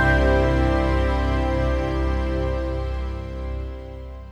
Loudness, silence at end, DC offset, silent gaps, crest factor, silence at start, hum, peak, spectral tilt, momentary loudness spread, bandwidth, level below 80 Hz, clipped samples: -23 LUFS; 0 s; under 0.1%; none; 14 dB; 0 s; none; -8 dBFS; -7.5 dB/octave; 14 LU; 7.6 kHz; -24 dBFS; under 0.1%